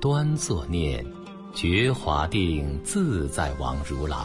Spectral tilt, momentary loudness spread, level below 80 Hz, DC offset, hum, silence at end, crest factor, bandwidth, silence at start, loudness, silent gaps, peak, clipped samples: -5.5 dB/octave; 8 LU; -36 dBFS; under 0.1%; none; 0 s; 16 dB; 11.5 kHz; 0 s; -26 LUFS; none; -8 dBFS; under 0.1%